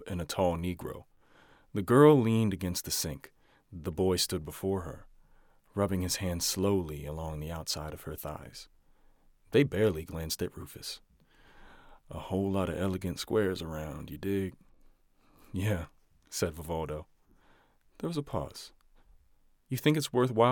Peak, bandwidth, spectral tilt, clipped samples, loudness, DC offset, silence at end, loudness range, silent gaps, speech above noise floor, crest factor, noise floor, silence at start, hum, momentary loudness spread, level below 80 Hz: -10 dBFS; 18 kHz; -5 dB/octave; under 0.1%; -31 LUFS; under 0.1%; 0 s; 10 LU; none; 34 dB; 22 dB; -65 dBFS; 0 s; none; 15 LU; -56 dBFS